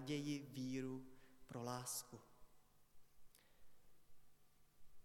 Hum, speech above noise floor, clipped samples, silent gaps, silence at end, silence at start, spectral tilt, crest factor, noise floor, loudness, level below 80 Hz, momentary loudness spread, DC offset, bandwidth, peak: none; 23 dB; under 0.1%; none; 0 s; 0 s; -4.5 dB/octave; 20 dB; -70 dBFS; -48 LUFS; -76 dBFS; 18 LU; under 0.1%; 18 kHz; -30 dBFS